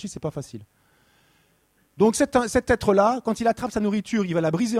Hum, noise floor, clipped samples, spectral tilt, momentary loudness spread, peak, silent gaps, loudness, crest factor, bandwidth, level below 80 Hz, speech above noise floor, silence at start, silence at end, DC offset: none; -64 dBFS; under 0.1%; -5.5 dB/octave; 13 LU; -6 dBFS; none; -22 LUFS; 18 dB; 15 kHz; -48 dBFS; 42 dB; 0 s; 0 s; under 0.1%